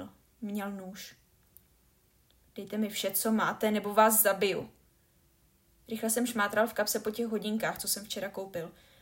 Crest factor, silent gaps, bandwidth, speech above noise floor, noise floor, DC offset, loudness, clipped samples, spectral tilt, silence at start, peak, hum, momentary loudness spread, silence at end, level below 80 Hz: 22 dB; none; 16.5 kHz; 36 dB; -67 dBFS; under 0.1%; -30 LUFS; under 0.1%; -3 dB/octave; 0 s; -10 dBFS; none; 21 LU; 0.3 s; -68 dBFS